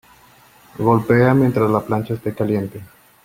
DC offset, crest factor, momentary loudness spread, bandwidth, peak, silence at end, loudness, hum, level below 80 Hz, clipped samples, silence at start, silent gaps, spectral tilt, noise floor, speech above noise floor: under 0.1%; 16 dB; 10 LU; 16.5 kHz; -2 dBFS; 0.4 s; -18 LUFS; none; -52 dBFS; under 0.1%; 0.8 s; none; -9 dB/octave; -49 dBFS; 32 dB